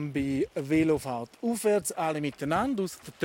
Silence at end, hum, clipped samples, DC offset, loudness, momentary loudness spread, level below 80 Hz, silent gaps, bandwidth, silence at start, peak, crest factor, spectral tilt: 0 s; none; under 0.1%; under 0.1%; -29 LUFS; 7 LU; -58 dBFS; none; 17 kHz; 0 s; -12 dBFS; 16 dB; -5.5 dB/octave